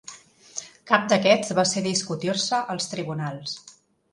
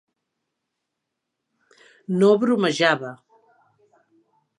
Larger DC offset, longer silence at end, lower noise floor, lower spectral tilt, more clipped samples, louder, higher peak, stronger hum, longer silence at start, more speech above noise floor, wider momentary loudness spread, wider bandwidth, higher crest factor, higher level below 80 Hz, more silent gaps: neither; second, 0.4 s vs 1.45 s; second, -46 dBFS vs -81 dBFS; second, -3.5 dB/octave vs -5.5 dB/octave; neither; second, -23 LUFS vs -20 LUFS; about the same, -2 dBFS vs -2 dBFS; neither; second, 0.1 s vs 2.1 s; second, 22 dB vs 62 dB; about the same, 17 LU vs 17 LU; about the same, 11.5 kHz vs 11 kHz; about the same, 24 dB vs 22 dB; first, -68 dBFS vs -78 dBFS; neither